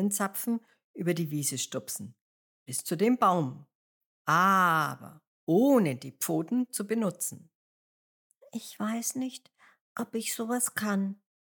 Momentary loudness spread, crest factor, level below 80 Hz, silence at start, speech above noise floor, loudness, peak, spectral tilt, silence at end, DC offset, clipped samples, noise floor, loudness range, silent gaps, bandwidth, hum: 17 LU; 18 dB; -90 dBFS; 0 s; over 61 dB; -29 LUFS; -12 dBFS; -4.5 dB/octave; 0.35 s; under 0.1%; under 0.1%; under -90 dBFS; 9 LU; 0.84-0.94 s, 2.21-2.66 s, 3.75-4.25 s, 5.27-5.47 s, 7.55-8.30 s, 9.81-9.95 s; 19.5 kHz; none